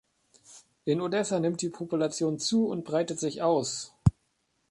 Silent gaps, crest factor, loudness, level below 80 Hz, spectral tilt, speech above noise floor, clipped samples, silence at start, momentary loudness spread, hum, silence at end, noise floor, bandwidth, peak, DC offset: none; 22 dB; -29 LUFS; -48 dBFS; -5.5 dB/octave; 46 dB; under 0.1%; 0.5 s; 5 LU; none; 0.6 s; -74 dBFS; 11.5 kHz; -8 dBFS; under 0.1%